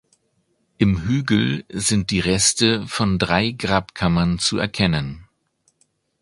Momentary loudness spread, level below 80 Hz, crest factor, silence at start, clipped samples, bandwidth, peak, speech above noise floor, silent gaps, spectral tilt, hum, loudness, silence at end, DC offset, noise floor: 5 LU; -40 dBFS; 20 dB; 0.8 s; under 0.1%; 11.5 kHz; 0 dBFS; 48 dB; none; -4 dB/octave; none; -19 LUFS; 1 s; under 0.1%; -67 dBFS